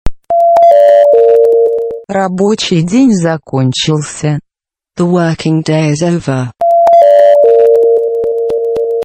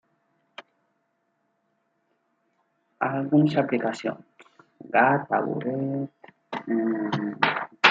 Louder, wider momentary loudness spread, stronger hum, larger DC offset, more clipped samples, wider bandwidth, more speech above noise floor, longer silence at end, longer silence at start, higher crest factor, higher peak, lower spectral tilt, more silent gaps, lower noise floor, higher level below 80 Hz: first, -9 LUFS vs -25 LUFS; about the same, 10 LU vs 12 LU; neither; neither; first, 0.9% vs under 0.1%; first, 8.8 kHz vs 7.8 kHz; first, 68 dB vs 49 dB; about the same, 0 s vs 0 s; second, 0.05 s vs 0.6 s; second, 8 dB vs 26 dB; about the same, 0 dBFS vs -2 dBFS; about the same, -6 dB/octave vs -6.5 dB/octave; neither; first, -79 dBFS vs -73 dBFS; first, -34 dBFS vs -74 dBFS